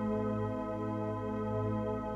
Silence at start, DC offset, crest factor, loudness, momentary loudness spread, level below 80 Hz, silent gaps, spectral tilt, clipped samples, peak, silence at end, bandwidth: 0 s; under 0.1%; 12 dB; -36 LUFS; 3 LU; -54 dBFS; none; -9.5 dB/octave; under 0.1%; -22 dBFS; 0 s; 7.4 kHz